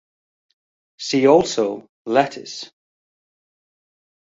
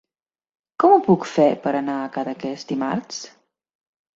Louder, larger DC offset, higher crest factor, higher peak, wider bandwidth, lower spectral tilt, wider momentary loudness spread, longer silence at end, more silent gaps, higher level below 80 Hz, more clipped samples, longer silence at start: about the same, -18 LUFS vs -20 LUFS; neither; about the same, 20 dB vs 20 dB; about the same, -2 dBFS vs -2 dBFS; about the same, 8 kHz vs 7.8 kHz; second, -4.5 dB/octave vs -6 dB/octave; first, 18 LU vs 15 LU; first, 1.7 s vs 0.85 s; first, 1.89-2.05 s vs none; about the same, -62 dBFS vs -66 dBFS; neither; first, 1 s vs 0.8 s